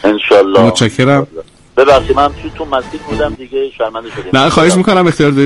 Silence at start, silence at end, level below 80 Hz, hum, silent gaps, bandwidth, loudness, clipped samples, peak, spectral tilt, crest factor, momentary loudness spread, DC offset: 0.05 s; 0 s; -34 dBFS; none; none; 11.5 kHz; -11 LUFS; 0.3%; 0 dBFS; -5.5 dB/octave; 10 dB; 11 LU; under 0.1%